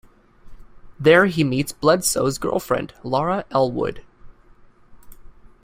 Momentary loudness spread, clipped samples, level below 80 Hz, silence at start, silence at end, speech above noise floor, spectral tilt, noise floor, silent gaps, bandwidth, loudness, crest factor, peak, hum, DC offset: 10 LU; under 0.1%; -48 dBFS; 0.45 s; 0.3 s; 30 dB; -4.5 dB/octave; -49 dBFS; none; 16 kHz; -20 LUFS; 20 dB; -2 dBFS; none; under 0.1%